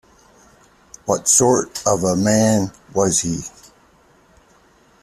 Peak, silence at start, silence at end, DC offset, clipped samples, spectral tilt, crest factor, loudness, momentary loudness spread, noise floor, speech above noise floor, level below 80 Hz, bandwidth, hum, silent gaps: 0 dBFS; 1.05 s; 1.55 s; under 0.1%; under 0.1%; -4 dB/octave; 20 dB; -17 LUFS; 13 LU; -53 dBFS; 36 dB; -52 dBFS; 14.5 kHz; none; none